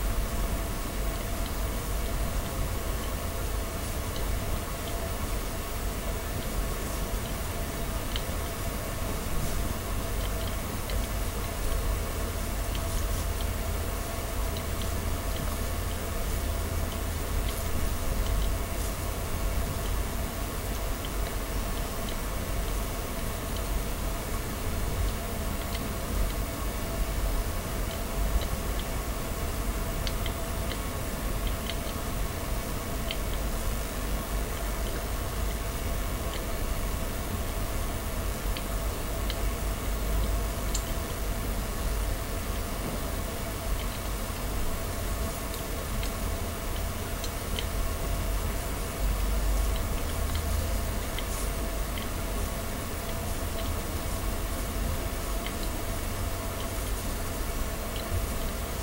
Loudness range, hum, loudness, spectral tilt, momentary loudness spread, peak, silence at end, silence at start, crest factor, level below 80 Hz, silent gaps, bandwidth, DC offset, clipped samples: 1 LU; none; -33 LUFS; -4.5 dB/octave; 2 LU; -12 dBFS; 0 s; 0 s; 18 dB; -32 dBFS; none; 16 kHz; under 0.1%; under 0.1%